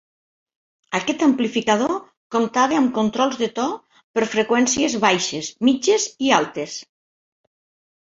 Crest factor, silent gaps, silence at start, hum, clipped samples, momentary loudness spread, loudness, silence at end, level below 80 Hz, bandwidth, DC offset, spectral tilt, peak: 20 dB; 2.17-2.30 s, 4.04-4.14 s; 0.9 s; none; under 0.1%; 9 LU; -20 LUFS; 1.2 s; -62 dBFS; 7.8 kHz; under 0.1%; -3 dB/octave; 0 dBFS